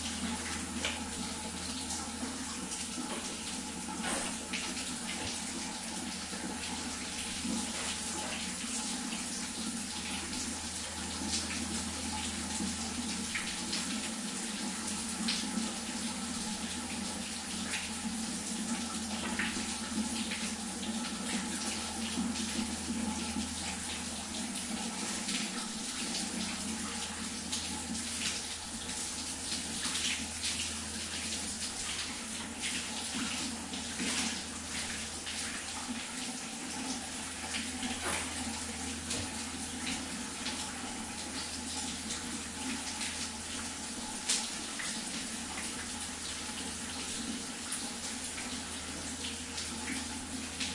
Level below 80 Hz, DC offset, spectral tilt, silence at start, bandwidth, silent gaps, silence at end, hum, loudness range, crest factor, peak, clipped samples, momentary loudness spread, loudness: -58 dBFS; under 0.1%; -2 dB/octave; 0 s; 11.5 kHz; none; 0 s; none; 2 LU; 20 dB; -18 dBFS; under 0.1%; 4 LU; -36 LUFS